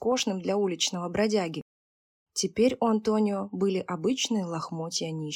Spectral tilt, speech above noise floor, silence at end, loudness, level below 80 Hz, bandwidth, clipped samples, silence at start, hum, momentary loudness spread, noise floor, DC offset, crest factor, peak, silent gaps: -4 dB/octave; over 63 dB; 0 s; -28 LUFS; -64 dBFS; 17.5 kHz; under 0.1%; 0 s; none; 7 LU; under -90 dBFS; under 0.1%; 16 dB; -12 dBFS; 1.62-2.26 s